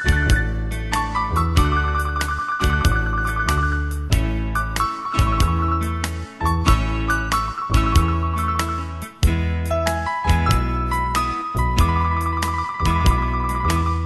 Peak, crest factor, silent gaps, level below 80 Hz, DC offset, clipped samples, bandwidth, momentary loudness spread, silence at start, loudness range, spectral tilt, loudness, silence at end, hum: -2 dBFS; 18 dB; none; -24 dBFS; under 0.1%; under 0.1%; 12.5 kHz; 5 LU; 0 s; 1 LU; -5 dB/octave; -21 LUFS; 0 s; none